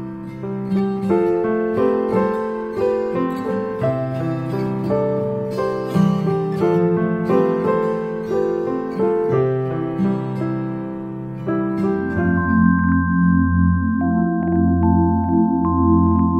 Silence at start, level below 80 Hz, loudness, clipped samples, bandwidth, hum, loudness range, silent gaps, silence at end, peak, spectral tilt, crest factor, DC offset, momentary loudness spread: 0 s; -46 dBFS; -19 LUFS; under 0.1%; 7 kHz; none; 5 LU; none; 0 s; -4 dBFS; -10 dB/octave; 14 dB; under 0.1%; 7 LU